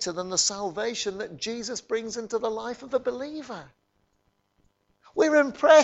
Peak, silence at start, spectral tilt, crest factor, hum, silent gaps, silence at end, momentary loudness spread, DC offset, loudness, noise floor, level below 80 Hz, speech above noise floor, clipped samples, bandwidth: -6 dBFS; 0 s; -2 dB/octave; 20 dB; none; none; 0 s; 14 LU; under 0.1%; -27 LUFS; -71 dBFS; -66 dBFS; 46 dB; under 0.1%; 8.2 kHz